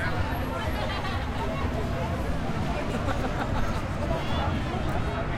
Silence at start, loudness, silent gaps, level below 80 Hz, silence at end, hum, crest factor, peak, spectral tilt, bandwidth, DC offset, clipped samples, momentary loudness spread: 0 s; -29 LUFS; none; -34 dBFS; 0 s; none; 14 dB; -14 dBFS; -6.5 dB/octave; 16 kHz; under 0.1%; under 0.1%; 2 LU